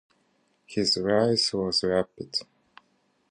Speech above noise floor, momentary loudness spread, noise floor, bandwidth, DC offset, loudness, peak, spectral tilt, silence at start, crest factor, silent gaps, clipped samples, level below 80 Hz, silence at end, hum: 43 dB; 9 LU; -69 dBFS; 11 kHz; under 0.1%; -25 LUFS; -10 dBFS; -4 dB/octave; 0.7 s; 18 dB; none; under 0.1%; -60 dBFS; 0.9 s; none